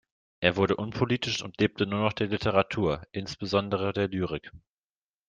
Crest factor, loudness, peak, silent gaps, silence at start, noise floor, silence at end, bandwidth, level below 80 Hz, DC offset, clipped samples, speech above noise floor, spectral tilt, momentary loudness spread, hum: 24 dB; -28 LUFS; -4 dBFS; none; 0.4 s; under -90 dBFS; 0.7 s; 9.4 kHz; -56 dBFS; under 0.1%; under 0.1%; over 62 dB; -6 dB/octave; 8 LU; none